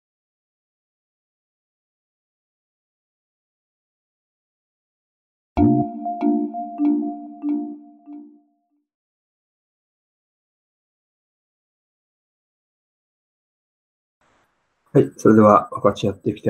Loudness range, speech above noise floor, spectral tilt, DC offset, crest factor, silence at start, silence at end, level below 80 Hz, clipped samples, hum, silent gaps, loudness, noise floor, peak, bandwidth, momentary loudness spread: 14 LU; 52 dB; -8 dB/octave; under 0.1%; 24 dB; 5.55 s; 0 s; -52 dBFS; under 0.1%; none; 8.94-14.21 s; -19 LUFS; -69 dBFS; -2 dBFS; 10 kHz; 16 LU